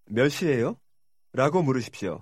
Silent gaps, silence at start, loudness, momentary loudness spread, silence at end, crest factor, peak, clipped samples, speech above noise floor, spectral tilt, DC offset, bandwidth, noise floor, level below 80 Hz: none; 0.1 s; -26 LUFS; 11 LU; 0 s; 20 dB; -6 dBFS; under 0.1%; 56 dB; -6 dB/octave; under 0.1%; 16 kHz; -81 dBFS; -64 dBFS